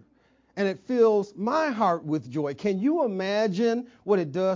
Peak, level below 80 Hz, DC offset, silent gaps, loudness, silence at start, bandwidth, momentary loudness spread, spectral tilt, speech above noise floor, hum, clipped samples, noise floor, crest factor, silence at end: -10 dBFS; -70 dBFS; under 0.1%; none; -26 LUFS; 0.55 s; 7.6 kHz; 7 LU; -7 dB/octave; 39 dB; none; under 0.1%; -63 dBFS; 16 dB; 0 s